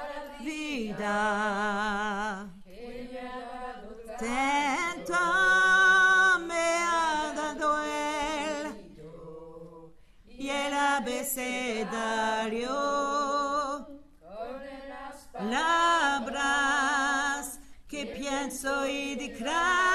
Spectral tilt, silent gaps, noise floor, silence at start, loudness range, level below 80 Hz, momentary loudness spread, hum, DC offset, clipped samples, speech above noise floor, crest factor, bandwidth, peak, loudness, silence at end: -2 dB/octave; none; -52 dBFS; 0 s; 9 LU; -54 dBFS; 20 LU; none; under 0.1%; under 0.1%; 23 dB; 16 dB; 13.5 kHz; -12 dBFS; -27 LUFS; 0 s